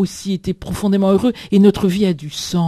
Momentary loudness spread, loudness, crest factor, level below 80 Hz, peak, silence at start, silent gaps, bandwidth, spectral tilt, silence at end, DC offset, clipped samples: 10 LU; -17 LUFS; 16 dB; -40 dBFS; 0 dBFS; 0 s; none; 14 kHz; -6.5 dB/octave; 0 s; under 0.1%; under 0.1%